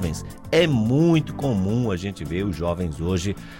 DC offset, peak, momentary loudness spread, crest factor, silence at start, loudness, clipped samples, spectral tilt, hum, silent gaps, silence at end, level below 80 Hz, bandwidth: under 0.1%; -4 dBFS; 9 LU; 18 dB; 0 s; -23 LUFS; under 0.1%; -6.5 dB/octave; none; none; 0 s; -40 dBFS; 16.5 kHz